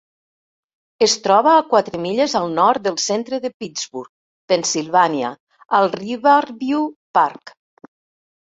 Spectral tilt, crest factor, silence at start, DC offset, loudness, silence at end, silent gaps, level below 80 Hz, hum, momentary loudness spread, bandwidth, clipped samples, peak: -3 dB/octave; 18 dB; 1 s; under 0.1%; -18 LUFS; 0.95 s; 3.54-3.60 s, 4.09-4.48 s, 5.40-5.47 s, 6.96-7.14 s; -64 dBFS; none; 12 LU; 8.2 kHz; under 0.1%; -2 dBFS